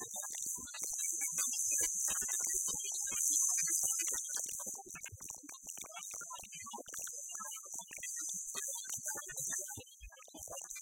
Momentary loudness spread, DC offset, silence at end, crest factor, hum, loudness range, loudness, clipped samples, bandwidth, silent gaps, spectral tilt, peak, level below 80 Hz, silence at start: 15 LU; under 0.1%; 0 s; 24 dB; none; 11 LU; -36 LUFS; under 0.1%; 17 kHz; none; 1 dB/octave; -16 dBFS; -68 dBFS; 0 s